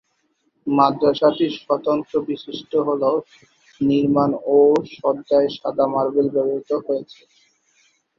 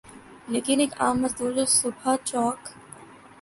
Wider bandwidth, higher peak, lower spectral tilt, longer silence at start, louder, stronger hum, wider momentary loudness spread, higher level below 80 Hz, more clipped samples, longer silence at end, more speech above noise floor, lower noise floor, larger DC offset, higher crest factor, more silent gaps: second, 6.8 kHz vs 12 kHz; first, -2 dBFS vs -8 dBFS; first, -7.5 dB/octave vs -2.5 dB/octave; first, 0.65 s vs 0.05 s; first, -20 LUFS vs -24 LUFS; neither; second, 8 LU vs 24 LU; about the same, -62 dBFS vs -60 dBFS; neither; first, 1.15 s vs 0.25 s; first, 48 dB vs 22 dB; first, -68 dBFS vs -47 dBFS; neither; about the same, 18 dB vs 18 dB; neither